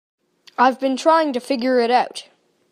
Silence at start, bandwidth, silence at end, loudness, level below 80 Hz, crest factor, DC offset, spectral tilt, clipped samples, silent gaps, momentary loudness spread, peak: 0.6 s; 14.5 kHz; 0.5 s; -18 LUFS; -76 dBFS; 18 dB; under 0.1%; -3.5 dB/octave; under 0.1%; none; 12 LU; -2 dBFS